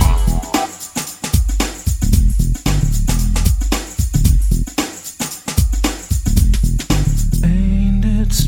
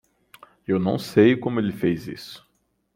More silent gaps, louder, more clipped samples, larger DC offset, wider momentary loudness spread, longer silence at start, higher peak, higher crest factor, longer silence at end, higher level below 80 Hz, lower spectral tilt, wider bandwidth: neither; first, -18 LUFS vs -22 LUFS; neither; neither; second, 7 LU vs 20 LU; second, 0 s vs 0.7 s; first, 0 dBFS vs -4 dBFS; second, 14 dB vs 20 dB; second, 0 s vs 0.6 s; first, -16 dBFS vs -60 dBFS; second, -5 dB/octave vs -7 dB/octave; about the same, 17 kHz vs 16.5 kHz